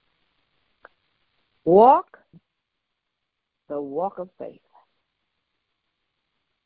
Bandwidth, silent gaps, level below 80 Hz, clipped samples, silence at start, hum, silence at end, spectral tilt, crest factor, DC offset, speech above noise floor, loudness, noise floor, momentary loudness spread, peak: 4.6 kHz; none; -66 dBFS; under 0.1%; 1.65 s; none; 2.15 s; -7 dB/octave; 22 dB; under 0.1%; 62 dB; -19 LUFS; -81 dBFS; 24 LU; -2 dBFS